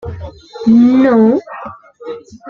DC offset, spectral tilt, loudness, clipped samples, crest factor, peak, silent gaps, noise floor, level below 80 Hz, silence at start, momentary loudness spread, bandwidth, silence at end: under 0.1%; -8.5 dB/octave; -10 LUFS; under 0.1%; 12 dB; -2 dBFS; none; -31 dBFS; -44 dBFS; 0.05 s; 23 LU; 6.8 kHz; 0 s